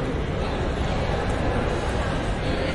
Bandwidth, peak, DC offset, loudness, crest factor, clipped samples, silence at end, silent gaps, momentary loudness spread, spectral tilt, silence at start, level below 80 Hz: 11.5 kHz; -12 dBFS; under 0.1%; -26 LUFS; 12 dB; under 0.1%; 0 s; none; 2 LU; -6.5 dB/octave; 0 s; -30 dBFS